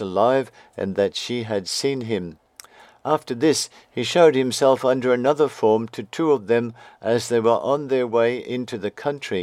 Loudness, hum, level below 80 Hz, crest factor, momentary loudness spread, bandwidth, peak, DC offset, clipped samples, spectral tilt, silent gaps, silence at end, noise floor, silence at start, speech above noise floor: -21 LUFS; none; -68 dBFS; 20 dB; 11 LU; 15 kHz; -2 dBFS; under 0.1%; under 0.1%; -4.5 dB/octave; none; 0 s; -47 dBFS; 0 s; 26 dB